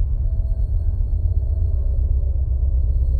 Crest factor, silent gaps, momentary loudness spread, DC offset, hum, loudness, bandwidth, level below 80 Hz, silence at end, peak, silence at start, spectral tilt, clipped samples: 10 dB; none; 2 LU; under 0.1%; none; -23 LUFS; 1.1 kHz; -18 dBFS; 0 s; -8 dBFS; 0 s; -12 dB/octave; under 0.1%